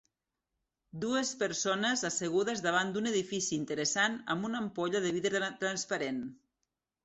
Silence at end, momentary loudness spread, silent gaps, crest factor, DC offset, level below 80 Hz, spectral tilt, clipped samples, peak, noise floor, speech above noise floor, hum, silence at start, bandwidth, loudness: 0.7 s; 5 LU; none; 18 dB; under 0.1%; -74 dBFS; -3 dB/octave; under 0.1%; -16 dBFS; -87 dBFS; 54 dB; none; 0.95 s; 8.2 kHz; -32 LUFS